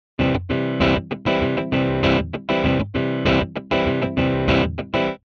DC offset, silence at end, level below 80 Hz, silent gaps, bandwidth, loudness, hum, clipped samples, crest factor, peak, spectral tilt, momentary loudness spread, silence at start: under 0.1%; 0.1 s; -36 dBFS; none; 6.8 kHz; -21 LUFS; none; under 0.1%; 16 dB; -4 dBFS; -7.5 dB/octave; 4 LU; 0.2 s